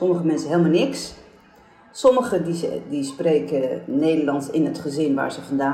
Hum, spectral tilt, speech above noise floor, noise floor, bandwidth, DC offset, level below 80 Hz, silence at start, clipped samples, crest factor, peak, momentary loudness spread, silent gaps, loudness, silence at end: none; -6 dB/octave; 30 dB; -51 dBFS; 13 kHz; under 0.1%; -60 dBFS; 0 s; under 0.1%; 16 dB; -4 dBFS; 9 LU; none; -22 LUFS; 0 s